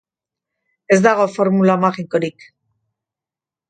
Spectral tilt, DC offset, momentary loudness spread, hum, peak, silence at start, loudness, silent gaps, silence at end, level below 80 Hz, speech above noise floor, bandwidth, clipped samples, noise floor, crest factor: -6.5 dB/octave; under 0.1%; 8 LU; none; 0 dBFS; 0.9 s; -16 LUFS; none; 1.4 s; -64 dBFS; 73 dB; 9.2 kHz; under 0.1%; -89 dBFS; 18 dB